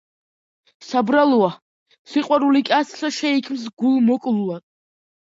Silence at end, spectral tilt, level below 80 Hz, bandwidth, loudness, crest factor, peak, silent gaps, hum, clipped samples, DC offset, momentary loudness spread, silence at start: 0.65 s; -5 dB/octave; -70 dBFS; 7.8 kHz; -19 LUFS; 18 dB; -2 dBFS; 1.62-1.86 s, 1.99-2.05 s, 3.73-3.77 s; none; under 0.1%; under 0.1%; 8 LU; 0.8 s